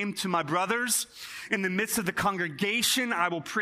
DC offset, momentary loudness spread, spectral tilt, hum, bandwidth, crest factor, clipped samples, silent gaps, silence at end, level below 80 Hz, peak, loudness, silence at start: under 0.1%; 5 LU; -2.5 dB/octave; none; 15.5 kHz; 18 dB; under 0.1%; none; 0 s; -64 dBFS; -10 dBFS; -27 LUFS; 0 s